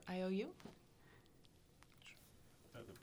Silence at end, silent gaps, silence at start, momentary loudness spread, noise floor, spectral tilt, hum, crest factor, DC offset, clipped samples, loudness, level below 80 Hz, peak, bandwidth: 0 s; none; 0 s; 26 LU; -68 dBFS; -6.5 dB/octave; none; 20 dB; under 0.1%; under 0.1%; -47 LUFS; -74 dBFS; -30 dBFS; over 20 kHz